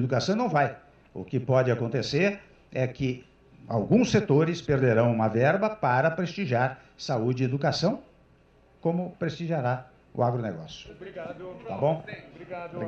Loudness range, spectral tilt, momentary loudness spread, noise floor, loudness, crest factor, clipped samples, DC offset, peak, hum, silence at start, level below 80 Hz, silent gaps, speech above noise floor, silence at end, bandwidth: 7 LU; -6.5 dB/octave; 17 LU; -59 dBFS; -26 LUFS; 18 dB; under 0.1%; under 0.1%; -10 dBFS; none; 0 s; -58 dBFS; none; 33 dB; 0 s; 8 kHz